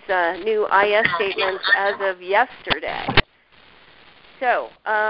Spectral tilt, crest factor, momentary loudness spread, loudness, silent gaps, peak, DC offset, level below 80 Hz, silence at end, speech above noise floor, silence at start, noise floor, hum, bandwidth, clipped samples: -8.5 dB/octave; 20 dB; 7 LU; -20 LUFS; none; 0 dBFS; under 0.1%; -42 dBFS; 0 s; 32 dB; 0.1 s; -52 dBFS; none; 5.6 kHz; under 0.1%